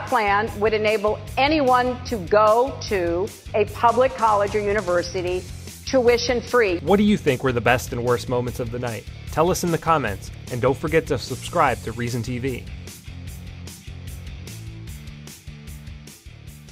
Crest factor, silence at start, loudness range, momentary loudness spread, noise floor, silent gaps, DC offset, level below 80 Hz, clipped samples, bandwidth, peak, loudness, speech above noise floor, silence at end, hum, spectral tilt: 20 dB; 0 s; 14 LU; 19 LU; -42 dBFS; none; under 0.1%; -40 dBFS; under 0.1%; 16 kHz; -2 dBFS; -21 LUFS; 21 dB; 0 s; none; -5 dB/octave